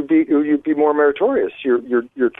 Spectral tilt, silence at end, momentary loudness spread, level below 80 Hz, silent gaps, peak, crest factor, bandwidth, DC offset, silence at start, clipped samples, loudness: -8.5 dB/octave; 0.1 s; 5 LU; -60 dBFS; none; -4 dBFS; 12 dB; 3.8 kHz; under 0.1%; 0 s; under 0.1%; -17 LUFS